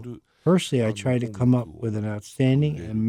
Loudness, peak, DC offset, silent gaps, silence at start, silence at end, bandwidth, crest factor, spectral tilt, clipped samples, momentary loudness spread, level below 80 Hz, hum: -24 LUFS; -10 dBFS; under 0.1%; none; 0 s; 0 s; 13 kHz; 14 dB; -7 dB/octave; under 0.1%; 9 LU; -54 dBFS; none